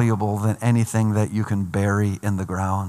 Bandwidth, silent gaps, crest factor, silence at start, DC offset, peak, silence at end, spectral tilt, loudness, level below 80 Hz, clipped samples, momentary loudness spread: 14.5 kHz; none; 14 dB; 0 s; under 0.1%; -6 dBFS; 0 s; -7.5 dB/octave; -22 LUFS; -58 dBFS; under 0.1%; 4 LU